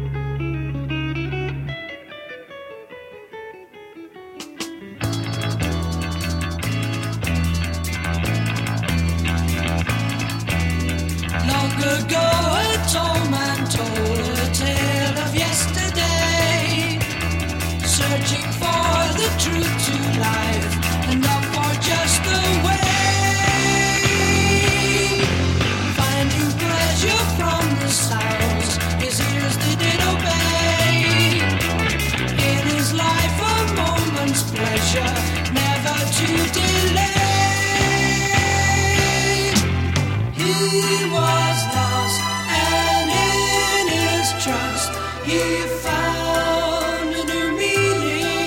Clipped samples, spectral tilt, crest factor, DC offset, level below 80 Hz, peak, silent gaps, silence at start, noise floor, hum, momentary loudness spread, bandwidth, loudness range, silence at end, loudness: under 0.1%; -4 dB/octave; 18 dB; under 0.1%; -34 dBFS; -2 dBFS; none; 0 s; -40 dBFS; none; 8 LU; 17 kHz; 7 LU; 0 s; -19 LUFS